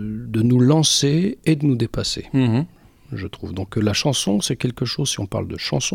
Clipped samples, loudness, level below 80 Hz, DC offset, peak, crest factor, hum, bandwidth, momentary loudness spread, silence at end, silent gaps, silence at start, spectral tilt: under 0.1%; -20 LUFS; -46 dBFS; under 0.1%; -4 dBFS; 16 dB; none; 16.5 kHz; 15 LU; 0 s; none; 0 s; -5 dB/octave